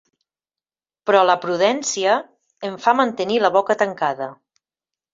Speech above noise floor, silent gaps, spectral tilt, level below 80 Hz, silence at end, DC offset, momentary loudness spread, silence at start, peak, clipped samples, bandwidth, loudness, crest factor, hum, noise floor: over 72 dB; none; -3 dB/octave; -70 dBFS; 0.8 s; under 0.1%; 13 LU; 1.05 s; -2 dBFS; under 0.1%; 7.8 kHz; -19 LUFS; 18 dB; none; under -90 dBFS